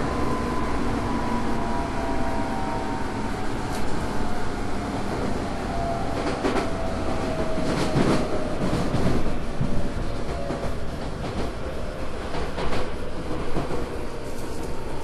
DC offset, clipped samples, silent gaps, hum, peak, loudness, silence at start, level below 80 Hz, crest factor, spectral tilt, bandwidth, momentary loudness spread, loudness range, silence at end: under 0.1%; under 0.1%; none; none; -8 dBFS; -28 LUFS; 0 s; -32 dBFS; 16 dB; -6 dB/octave; 12 kHz; 8 LU; 5 LU; 0 s